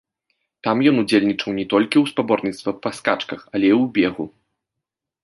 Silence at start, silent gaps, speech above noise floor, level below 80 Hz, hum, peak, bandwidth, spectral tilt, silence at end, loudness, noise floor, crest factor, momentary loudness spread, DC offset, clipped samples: 0.65 s; none; 65 dB; -60 dBFS; none; -2 dBFS; 11.5 kHz; -6 dB/octave; 0.95 s; -19 LUFS; -83 dBFS; 18 dB; 9 LU; under 0.1%; under 0.1%